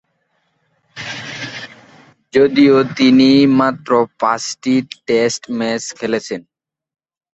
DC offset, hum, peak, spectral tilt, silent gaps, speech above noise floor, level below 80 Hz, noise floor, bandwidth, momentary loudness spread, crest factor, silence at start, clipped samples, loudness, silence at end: under 0.1%; none; 0 dBFS; -5 dB/octave; none; 52 dB; -58 dBFS; -65 dBFS; 8.2 kHz; 17 LU; 16 dB; 0.95 s; under 0.1%; -15 LUFS; 0.95 s